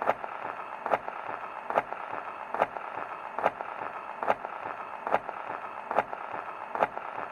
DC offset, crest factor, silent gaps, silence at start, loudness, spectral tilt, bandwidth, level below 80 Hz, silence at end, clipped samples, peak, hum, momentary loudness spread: under 0.1%; 24 dB; none; 0 s; -34 LUFS; -5.5 dB/octave; 13.5 kHz; -72 dBFS; 0 s; under 0.1%; -8 dBFS; none; 7 LU